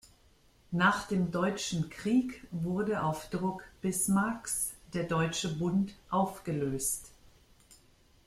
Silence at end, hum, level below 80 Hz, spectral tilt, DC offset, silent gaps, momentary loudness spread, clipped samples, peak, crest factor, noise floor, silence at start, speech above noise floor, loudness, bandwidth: 0.5 s; none; -58 dBFS; -4.5 dB/octave; under 0.1%; none; 8 LU; under 0.1%; -12 dBFS; 20 dB; -64 dBFS; 0.7 s; 32 dB; -32 LUFS; 15.5 kHz